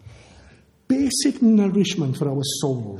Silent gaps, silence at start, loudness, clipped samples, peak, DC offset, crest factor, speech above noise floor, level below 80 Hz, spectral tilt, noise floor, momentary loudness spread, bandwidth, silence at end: none; 0.05 s; -20 LUFS; under 0.1%; -6 dBFS; under 0.1%; 14 dB; 32 dB; -56 dBFS; -5 dB/octave; -52 dBFS; 7 LU; 13.5 kHz; 0 s